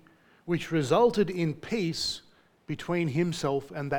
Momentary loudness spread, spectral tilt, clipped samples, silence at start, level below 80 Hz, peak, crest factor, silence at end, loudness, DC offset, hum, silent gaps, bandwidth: 13 LU; -5.5 dB/octave; under 0.1%; 0.45 s; -58 dBFS; -10 dBFS; 18 dB; 0 s; -28 LUFS; under 0.1%; none; none; 18 kHz